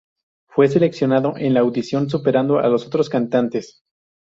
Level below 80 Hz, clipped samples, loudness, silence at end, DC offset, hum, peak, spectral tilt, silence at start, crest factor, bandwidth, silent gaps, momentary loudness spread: -60 dBFS; under 0.1%; -18 LUFS; 0.7 s; under 0.1%; none; -2 dBFS; -7.5 dB/octave; 0.55 s; 16 dB; 7.8 kHz; none; 5 LU